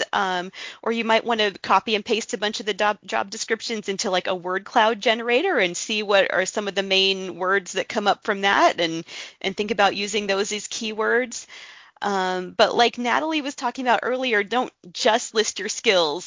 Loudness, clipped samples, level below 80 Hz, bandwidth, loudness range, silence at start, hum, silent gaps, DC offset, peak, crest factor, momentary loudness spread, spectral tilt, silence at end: -22 LUFS; under 0.1%; -66 dBFS; 7.8 kHz; 3 LU; 0 s; none; none; under 0.1%; -2 dBFS; 22 dB; 8 LU; -2.5 dB/octave; 0 s